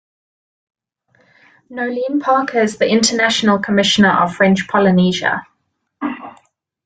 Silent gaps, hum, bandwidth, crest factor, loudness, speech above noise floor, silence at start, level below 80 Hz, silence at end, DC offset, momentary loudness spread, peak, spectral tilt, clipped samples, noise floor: none; none; 9.4 kHz; 16 dB; -15 LUFS; 54 dB; 1.7 s; -56 dBFS; 0.55 s; under 0.1%; 13 LU; 0 dBFS; -4.5 dB/octave; under 0.1%; -69 dBFS